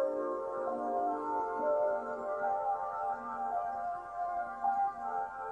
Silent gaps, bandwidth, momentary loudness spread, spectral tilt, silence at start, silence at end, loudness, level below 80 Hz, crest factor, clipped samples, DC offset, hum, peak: none; 9.6 kHz; 5 LU; -6.5 dB/octave; 0 s; 0 s; -35 LUFS; -70 dBFS; 12 dB; under 0.1%; under 0.1%; none; -22 dBFS